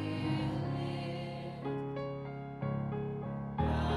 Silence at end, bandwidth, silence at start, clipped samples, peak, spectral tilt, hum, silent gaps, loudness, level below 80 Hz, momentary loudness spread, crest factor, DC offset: 0 s; 10.5 kHz; 0 s; under 0.1%; -20 dBFS; -8 dB/octave; none; none; -38 LUFS; -48 dBFS; 6 LU; 16 dB; under 0.1%